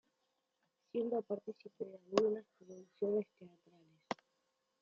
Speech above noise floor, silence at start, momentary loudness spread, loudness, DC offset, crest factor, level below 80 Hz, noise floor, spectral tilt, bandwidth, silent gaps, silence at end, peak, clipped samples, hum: 44 dB; 0.95 s; 18 LU; -40 LUFS; under 0.1%; 28 dB; -88 dBFS; -84 dBFS; -6 dB/octave; 7.6 kHz; none; 0.7 s; -14 dBFS; under 0.1%; none